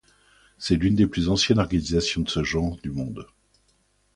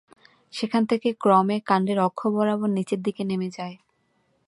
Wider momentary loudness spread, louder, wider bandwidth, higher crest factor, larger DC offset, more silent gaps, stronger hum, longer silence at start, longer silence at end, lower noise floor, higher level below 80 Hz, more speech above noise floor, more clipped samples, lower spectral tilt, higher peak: about the same, 12 LU vs 12 LU; about the same, -24 LUFS vs -24 LUFS; about the same, 11.5 kHz vs 11.5 kHz; about the same, 20 dB vs 20 dB; neither; neither; first, 50 Hz at -45 dBFS vs none; about the same, 0.6 s vs 0.55 s; first, 0.9 s vs 0.75 s; about the same, -66 dBFS vs -69 dBFS; first, -40 dBFS vs -72 dBFS; about the same, 43 dB vs 45 dB; neither; second, -5 dB/octave vs -7 dB/octave; about the same, -6 dBFS vs -6 dBFS